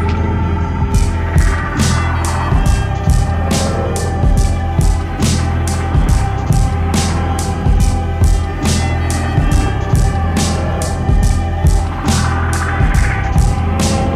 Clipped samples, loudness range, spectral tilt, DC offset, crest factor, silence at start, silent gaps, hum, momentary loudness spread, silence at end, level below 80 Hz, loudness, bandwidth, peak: under 0.1%; 0 LU; -5.5 dB/octave; under 0.1%; 12 dB; 0 s; none; none; 2 LU; 0 s; -16 dBFS; -15 LUFS; 14 kHz; -2 dBFS